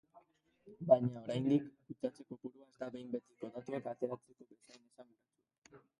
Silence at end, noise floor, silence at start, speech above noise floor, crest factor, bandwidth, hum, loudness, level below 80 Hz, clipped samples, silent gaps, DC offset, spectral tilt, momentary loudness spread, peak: 0.2 s; -68 dBFS; 0.15 s; 30 dB; 26 dB; 11 kHz; none; -38 LUFS; -80 dBFS; under 0.1%; 5.58-5.62 s; under 0.1%; -8.5 dB/octave; 19 LU; -14 dBFS